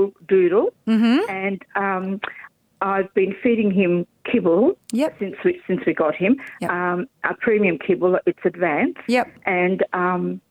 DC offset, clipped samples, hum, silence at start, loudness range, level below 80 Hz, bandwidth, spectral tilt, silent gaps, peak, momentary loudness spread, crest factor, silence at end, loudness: under 0.1%; under 0.1%; none; 0 s; 1 LU; -64 dBFS; 11.5 kHz; -7.5 dB/octave; none; -6 dBFS; 7 LU; 14 dB; 0.1 s; -21 LUFS